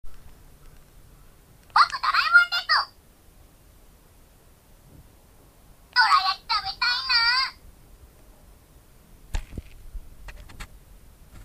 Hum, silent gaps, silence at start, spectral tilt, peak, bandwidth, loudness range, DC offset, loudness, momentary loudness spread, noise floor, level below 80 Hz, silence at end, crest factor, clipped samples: none; none; 0.05 s; -1 dB/octave; -4 dBFS; 15.5 kHz; 21 LU; under 0.1%; -21 LUFS; 26 LU; -54 dBFS; -46 dBFS; 0 s; 22 dB; under 0.1%